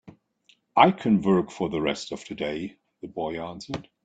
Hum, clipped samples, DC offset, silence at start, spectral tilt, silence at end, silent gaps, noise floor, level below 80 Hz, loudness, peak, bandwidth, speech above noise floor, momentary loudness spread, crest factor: none; under 0.1%; under 0.1%; 0.05 s; -6 dB/octave; 0.2 s; none; -64 dBFS; -60 dBFS; -25 LUFS; -4 dBFS; 8.6 kHz; 39 dB; 17 LU; 24 dB